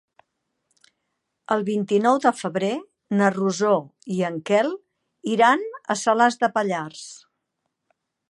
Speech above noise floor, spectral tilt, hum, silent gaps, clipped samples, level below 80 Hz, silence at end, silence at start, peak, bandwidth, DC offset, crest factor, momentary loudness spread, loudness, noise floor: 57 dB; -5 dB/octave; none; none; under 0.1%; -76 dBFS; 1.15 s; 1.5 s; -4 dBFS; 11.5 kHz; under 0.1%; 20 dB; 12 LU; -22 LUFS; -78 dBFS